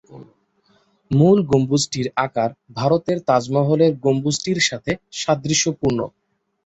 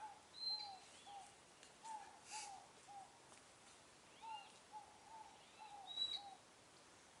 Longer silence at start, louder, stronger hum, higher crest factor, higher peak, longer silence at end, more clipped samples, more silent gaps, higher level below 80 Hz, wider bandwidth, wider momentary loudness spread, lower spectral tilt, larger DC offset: about the same, 0.1 s vs 0 s; first, -19 LUFS vs -51 LUFS; neither; second, 16 dB vs 22 dB; first, -4 dBFS vs -34 dBFS; first, 0.6 s vs 0 s; neither; neither; first, -52 dBFS vs -88 dBFS; second, 8.2 kHz vs 11.5 kHz; second, 9 LU vs 19 LU; first, -5 dB/octave vs 0 dB/octave; neither